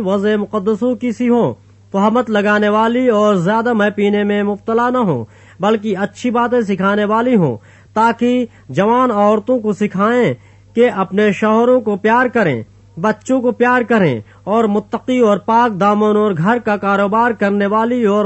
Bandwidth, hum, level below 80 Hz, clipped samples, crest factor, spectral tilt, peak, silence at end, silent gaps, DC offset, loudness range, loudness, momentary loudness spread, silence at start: 8.4 kHz; none; -56 dBFS; under 0.1%; 12 dB; -7 dB/octave; -2 dBFS; 0 s; none; under 0.1%; 2 LU; -15 LUFS; 7 LU; 0 s